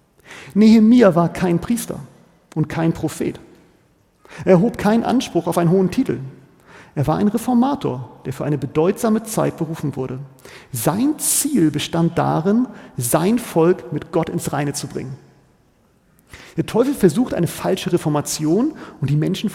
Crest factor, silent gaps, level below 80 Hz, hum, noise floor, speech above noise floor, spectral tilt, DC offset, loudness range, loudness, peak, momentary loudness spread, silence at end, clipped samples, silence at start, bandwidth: 18 dB; none; -50 dBFS; none; -57 dBFS; 39 dB; -6 dB/octave; under 0.1%; 5 LU; -18 LUFS; -2 dBFS; 14 LU; 0 s; under 0.1%; 0.3 s; 17 kHz